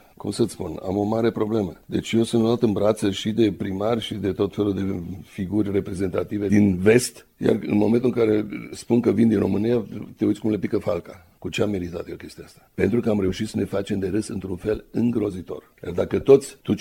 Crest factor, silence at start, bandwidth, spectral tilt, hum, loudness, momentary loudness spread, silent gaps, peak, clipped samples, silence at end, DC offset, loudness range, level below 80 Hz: 20 dB; 0.25 s; 16.5 kHz; -6.5 dB/octave; none; -23 LUFS; 13 LU; none; -2 dBFS; under 0.1%; 0 s; under 0.1%; 5 LU; -50 dBFS